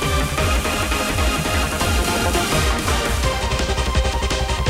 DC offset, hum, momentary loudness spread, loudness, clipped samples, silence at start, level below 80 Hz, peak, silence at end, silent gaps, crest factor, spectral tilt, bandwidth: under 0.1%; none; 2 LU; -20 LUFS; under 0.1%; 0 s; -24 dBFS; -4 dBFS; 0 s; none; 14 dB; -4 dB/octave; 16 kHz